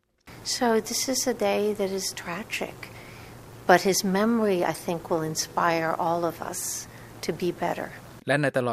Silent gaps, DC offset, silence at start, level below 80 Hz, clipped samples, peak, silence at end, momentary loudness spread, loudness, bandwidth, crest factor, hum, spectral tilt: none; under 0.1%; 0.25 s; -58 dBFS; under 0.1%; -2 dBFS; 0 s; 15 LU; -26 LUFS; 15.5 kHz; 24 dB; none; -3.5 dB/octave